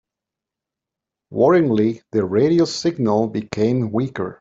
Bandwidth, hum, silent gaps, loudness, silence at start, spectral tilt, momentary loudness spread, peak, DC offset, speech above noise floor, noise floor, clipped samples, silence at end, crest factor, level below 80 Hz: 7.8 kHz; none; none; -19 LUFS; 1.3 s; -7 dB/octave; 8 LU; -4 dBFS; under 0.1%; 68 dB; -86 dBFS; under 0.1%; 0.05 s; 16 dB; -58 dBFS